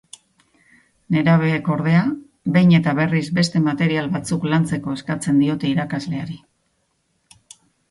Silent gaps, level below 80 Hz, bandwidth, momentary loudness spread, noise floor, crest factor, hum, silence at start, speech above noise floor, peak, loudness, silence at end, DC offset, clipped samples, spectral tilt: none; -56 dBFS; 11.5 kHz; 10 LU; -68 dBFS; 18 dB; none; 1.1 s; 50 dB; -2 dBFS; -19 LUFS; 1.55 s; under 0.1%; under 0.1%; -6.5 dB/octave